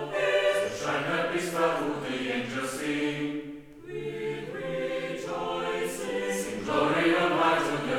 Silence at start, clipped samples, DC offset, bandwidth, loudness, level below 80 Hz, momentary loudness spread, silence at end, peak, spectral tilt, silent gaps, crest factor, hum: 0 s; under 0.1%; under 0.1%; 18.5 kHz; -28 LUFS; -60 dBFS; 10 LU; 0 s; -12 dBFS; -4.5 dB/octave; none; 16 dB; none